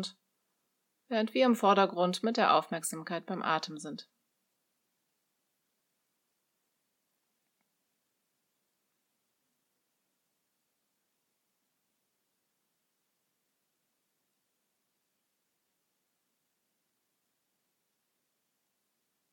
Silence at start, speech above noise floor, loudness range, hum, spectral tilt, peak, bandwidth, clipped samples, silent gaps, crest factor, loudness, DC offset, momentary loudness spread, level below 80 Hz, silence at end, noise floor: 0 s; 52 dB; 11 LU; none; -4 dB/octave; -12 dBFS; 17.5 kHz; under 0.1%; none; 26 dB; -29 LUFS; under 0.1%; 16 LU; under -90 dBFS; 15.3 s; -81 dBFS